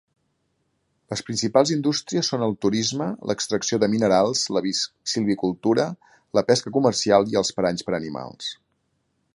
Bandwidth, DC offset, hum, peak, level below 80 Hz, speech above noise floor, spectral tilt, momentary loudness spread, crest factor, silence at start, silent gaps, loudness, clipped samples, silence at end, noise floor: 11.5 kHz; under 0.1%; none; -2 dBFS; -60 dBFS; 49 dB; -4 dB/octave; 11 LU; 22 dB; 1.1 s; none; -22 LUFS; under 0.1%; 0.8 s; -71 dBFS